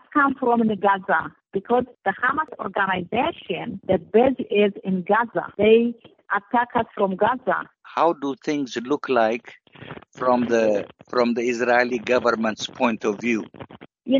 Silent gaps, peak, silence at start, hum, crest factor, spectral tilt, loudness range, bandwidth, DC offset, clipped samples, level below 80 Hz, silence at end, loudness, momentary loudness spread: none; -4 dBFS; 0.15 s; none; 18 dB; -3.5 dB/octave; 3 LU; 7.6 kHz; under 0.1%; under 0.1%; -60 dBFS; 0 s; -22 LUFS; 10 LU